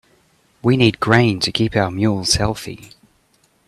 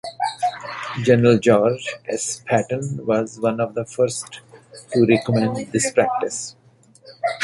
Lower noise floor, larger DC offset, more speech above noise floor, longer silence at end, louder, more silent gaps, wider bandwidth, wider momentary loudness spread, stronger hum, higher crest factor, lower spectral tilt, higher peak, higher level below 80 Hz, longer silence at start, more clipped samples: first, -59 dBFS vs -52 dBFS; neither; first, 43 dB vs 33 dB; first, 0.8 s vs 0 s; first, -17 LUFS vs -20 LUFS; neither; first, 13.5 kHz vs 11.5 kHz; about the same, 12 LU vs 13 LU; neither; about the same, 18 dB vs 18 dB; about the same, -5 dB/octave vs -5 dB/octave; about the same, 0 dBFS vs -2 dBFS; first, -42 dBFS vs -58 dBFS; first, 0.65 s vs 0.05 s; neither